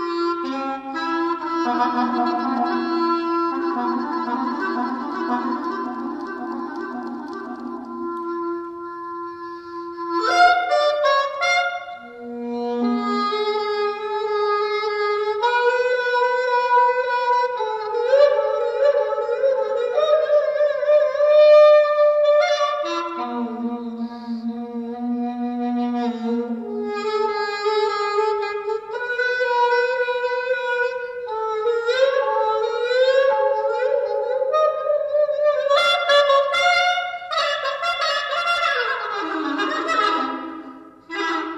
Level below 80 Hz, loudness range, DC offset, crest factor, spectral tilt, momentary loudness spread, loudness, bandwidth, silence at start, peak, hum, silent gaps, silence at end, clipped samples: -66 dBFS; 10 LU; under 0.1%; 16 dB; -3 dB/octave; 13 LU; -20 LUFS; 9.6 kHz; 0 s; -4 dBFS; none; none; 0 s; under 0.1%